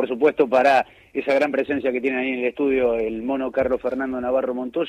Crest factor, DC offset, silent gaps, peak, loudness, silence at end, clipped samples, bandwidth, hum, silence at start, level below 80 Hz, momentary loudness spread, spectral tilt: 16 dB; under 0.1%; none; -6 dBFS; -21 LUFS; 0 s; under 0.1%; 10.5 kHz; none; 0 s; -52 dBFS; 8 LU; -6 dB/octave